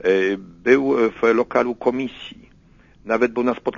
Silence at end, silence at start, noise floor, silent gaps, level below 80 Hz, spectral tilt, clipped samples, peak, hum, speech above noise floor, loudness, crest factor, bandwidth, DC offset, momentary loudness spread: 0 s; 0 s; -51 dBFS; none; -54 dBFS; -6 dB/octave; under 0.1%; -2 dBFS; none; 32 dB; -20 LUFS; 18 dB; 7.2 kHz; under 0.1%; 11 LU